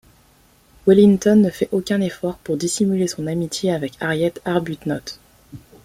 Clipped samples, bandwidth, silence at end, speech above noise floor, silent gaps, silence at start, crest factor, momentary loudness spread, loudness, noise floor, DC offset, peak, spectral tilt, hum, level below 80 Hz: under 0.1%; 15 kHz; 0.25 s; 36 dB; none; 0.85 s; 18 dB; 13 LU; -19 LUFS; -54 dBFS; under 0.1%; -2 dBFS; -6 dB/octave; none; -52 dBFS